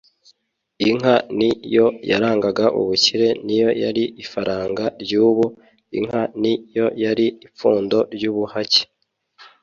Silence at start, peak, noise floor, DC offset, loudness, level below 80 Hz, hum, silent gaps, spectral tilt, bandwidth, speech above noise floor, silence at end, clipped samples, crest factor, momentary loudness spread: 0.8 s; -2 dBFS; -66 dBFS; under 0.1%; -19 LUFS; -58 dBFS; none; none; -4.5 dB/octave; 7.6 kHz; 47 dB; 0.15 s; under 0.1%; 18 dB; 8 LU